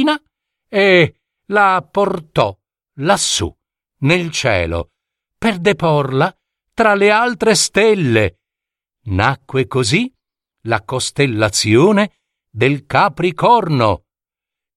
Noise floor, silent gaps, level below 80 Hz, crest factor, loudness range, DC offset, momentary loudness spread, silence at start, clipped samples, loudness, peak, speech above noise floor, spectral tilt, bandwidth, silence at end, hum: -87 dBFS; none; -44 dBFS; 16 dB; 4 LU; under 0.1%; 10 LU; 0 s; under 0.1%; -15 LUFS; 0 dBFS; 73 dB; -4.5 dB/octave; 14 kHz; 0.8 s; none